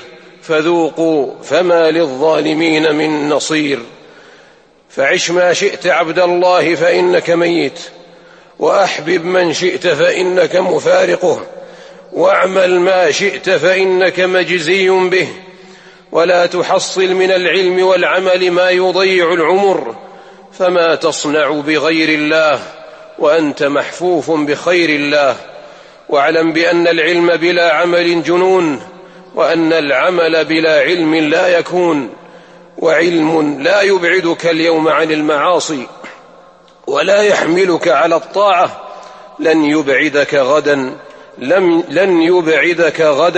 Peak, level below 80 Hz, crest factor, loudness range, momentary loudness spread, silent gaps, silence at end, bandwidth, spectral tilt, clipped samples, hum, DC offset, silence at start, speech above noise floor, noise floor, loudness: 0 dBFS; -60 dBFS; 12 dB; 2 LU; 7 LU; none; 0 s; 8.8 kHz; -4 dB/octave; under 0.1%; none; under 0.1%; 0 s; 34 dB; -45 dBFS; -12 LUFS